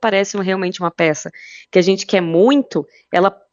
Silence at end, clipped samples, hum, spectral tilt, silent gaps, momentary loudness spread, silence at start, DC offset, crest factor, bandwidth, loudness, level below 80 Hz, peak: 0.2 s; under 0.1%; none; -5 dB/octave; none; 11 LU; 0 s; under 0.1%; 16 dB; 7.6 kHz; -17 LUFS; -64 dBFS; 0 dBFS